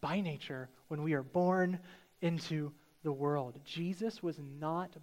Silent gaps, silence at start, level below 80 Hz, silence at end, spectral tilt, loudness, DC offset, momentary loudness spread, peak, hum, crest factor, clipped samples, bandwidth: none; 0 s; -74 dBFS; 0 s; -7 dB/octave; -37 LUFS; under 0.1%; 11 LU; -20 dBFS; none; 18 dB; under 0.1%; 16 kHz